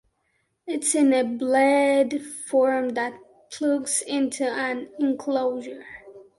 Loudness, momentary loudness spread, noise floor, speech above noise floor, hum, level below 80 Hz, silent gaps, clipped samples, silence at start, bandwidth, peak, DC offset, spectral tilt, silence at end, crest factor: -23 LUFS; 17 LU; -72 dBFS; 49 dB; none; -70 dBFS; none; under 0.1%; 0.65 s; 11.5 kHz; -8 dBFS; under 0.1%; -2.5 dB/octave; 0.15 s; 16 dB